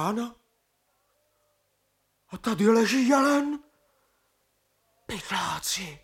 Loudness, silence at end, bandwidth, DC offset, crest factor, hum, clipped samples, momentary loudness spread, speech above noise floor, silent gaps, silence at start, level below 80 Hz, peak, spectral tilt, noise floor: -25 LUFS; 0.05 s; 17 kHz; under 0.1%; 20 dB; 50 Hz at -70 dBFS; under 0.1%; 17 LU; 48 dB; none; 0 s; -62 dBFS; -8 dBFS; -4 dB/octave; -73 dBFS